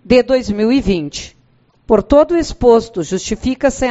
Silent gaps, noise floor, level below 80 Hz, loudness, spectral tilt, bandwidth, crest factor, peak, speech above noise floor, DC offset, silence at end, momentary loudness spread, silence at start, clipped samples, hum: none; -54 dBFS; -32 dBFS; -14 LUFS; -5.5 dB/octave; 8.2 kHz; 14 dB; 0 dBFS; 40 dB; under 0.1%; 0 s; 9 LU; 0.05 s; under 0.1%; none